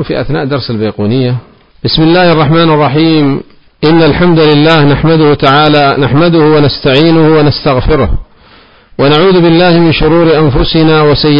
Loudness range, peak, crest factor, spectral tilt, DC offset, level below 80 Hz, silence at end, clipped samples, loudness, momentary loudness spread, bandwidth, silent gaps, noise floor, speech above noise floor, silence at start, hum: 3 LU; 0 dBFS; 8 dB; -8.5 dB/octave; 4%; -24 dBFS; 0 s; under 0.1%; -7 LUFS; 8 LU; 5.4 kHz; none; -39 dBFS; 33 dB; 0 s; none